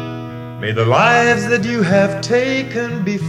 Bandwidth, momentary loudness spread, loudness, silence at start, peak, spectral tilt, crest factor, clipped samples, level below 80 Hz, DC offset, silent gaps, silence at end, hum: 12.5 kHz; 14 LU; -15 LUFS; 0 s; 0 dBFS; -5.5 dB/octave; 16 dB; under 0.1%; -50 dBFS; under 0.1%; none; 0 s; none